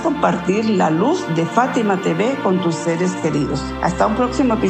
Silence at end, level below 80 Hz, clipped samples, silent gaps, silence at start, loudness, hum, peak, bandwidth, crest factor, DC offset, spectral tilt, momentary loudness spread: 0 s; -40 dBFS; under 0.1%; none; 0 s; -18 LUFS; none; -2 dBFS; 9.2 kHz; 16 dB; under 0.1%; -6 dB/octave; 3 LU